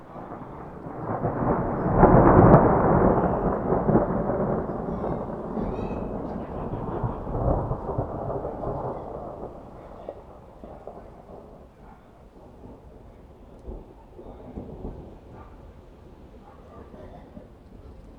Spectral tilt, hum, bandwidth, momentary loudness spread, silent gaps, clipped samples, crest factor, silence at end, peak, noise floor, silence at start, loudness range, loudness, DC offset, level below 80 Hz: -11.5 dB/octave; none; 4.7 kHz; 28 LU; none; under 0.1%; 26 dB; 0 s; 0 dBFS; -49 dBFS; 0 s; 26 LU; -23 LUFS; under 0.1%; -38 dBFS